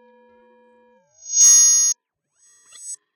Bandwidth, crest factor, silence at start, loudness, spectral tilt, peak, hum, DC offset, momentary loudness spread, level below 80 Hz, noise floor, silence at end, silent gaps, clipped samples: 16 kHz; 16 dB; 1.25 s; -11 LUFS; 5.5 dB/octave; -4 dBFS; none; under 0.1%; 25 LU; under -90 dBFS; -67 dBFS; 0.2 s; none; under 0.1%